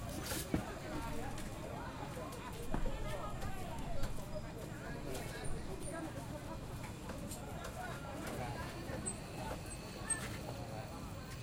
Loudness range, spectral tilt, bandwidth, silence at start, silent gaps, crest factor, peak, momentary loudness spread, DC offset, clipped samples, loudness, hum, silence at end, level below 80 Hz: 2 LU; -4.5 dB/octave; 16.5 kHz; 0 s; none; 22 dB; -20 dBFS; 6 LU; under 0.1%; under 0.1%; -44 LUFS; none; 0 s; -48 dBFS